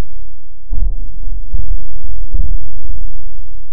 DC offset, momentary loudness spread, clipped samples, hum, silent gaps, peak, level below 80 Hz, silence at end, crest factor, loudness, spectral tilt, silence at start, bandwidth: 70%; 16 LU; 0.1%; none; none; 0 dBFS; -20 dBFS; 0 s; 10 dB; -27 LUFS; -14.5 dB/octave; 0 s; 0.9 kHz